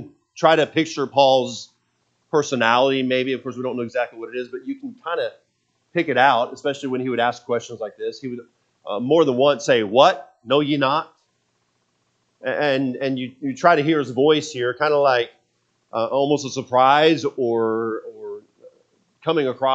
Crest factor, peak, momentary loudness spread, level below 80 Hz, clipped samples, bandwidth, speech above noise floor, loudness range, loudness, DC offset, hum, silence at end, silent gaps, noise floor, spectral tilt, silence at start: 20 dB; 0 dBFS; 15 LU; -74 dBFS; under 0.1%; 8.2 kHz; 49 dB; 4 LU; -20 LUFS; under 0.1%; none; 0 s; none; -69 dBFS; -5 dB/octave; 0 s